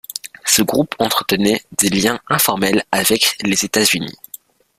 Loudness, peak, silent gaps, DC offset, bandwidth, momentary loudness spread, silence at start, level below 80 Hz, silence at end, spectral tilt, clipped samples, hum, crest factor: -15 LUFS; 0 dBFS; none; under 0.1%; 16 kHz; 9 LU; 0.25 s; -50 dBFS; 0.65 s; -2.5 dB/octave; under 0.1%; none; 18 dB